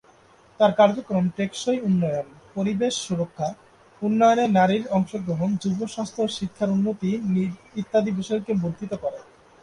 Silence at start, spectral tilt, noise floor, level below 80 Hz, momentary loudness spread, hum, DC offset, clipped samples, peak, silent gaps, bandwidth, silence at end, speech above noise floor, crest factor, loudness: 0.6 s; -6 dB/octave; -54 dBFS; -60 dBFS; 11 LU; none; under 0.1%; under 0.1%; -4 dBFS; none; 11 kHz; 0.4 s; 32 dB; 18 dB; -24 LUFS